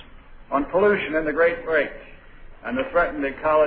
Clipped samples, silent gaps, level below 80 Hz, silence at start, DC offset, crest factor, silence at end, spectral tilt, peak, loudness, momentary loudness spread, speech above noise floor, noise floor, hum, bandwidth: under 0.1%; none; -44 dBFS; 0 s; under 0.1%; 16 dB; 0 s; -9 dB/octave; -8 dBFS; -22 LUFS; 10 LU; 22 dB; -43 dBFS; none; 4.9 kHz